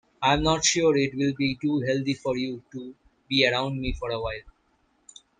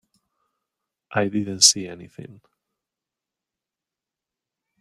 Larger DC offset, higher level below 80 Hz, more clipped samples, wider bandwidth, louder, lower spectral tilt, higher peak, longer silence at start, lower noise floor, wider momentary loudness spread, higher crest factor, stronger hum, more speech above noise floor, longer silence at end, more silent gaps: neither; first, -44 dBFS vs -70 dBFS; neither; second, 9.6 kHz vs 15.5 kHz; second, -25 LUFS vs -19 LUFS; first, -4 dB/octave vs -1.5 dB/octave; second, -6 dBFS vs 0 dBFS; second, 0.2 s vs 1.1 s; second, -68 dBFS vs -88 dBFS; second, 16 LU vs 20 LU; second, 20 dB vs 28 dB; neither; second, 42 dB vs 66 dB; second, 0.9 s vs 2.5 s; neither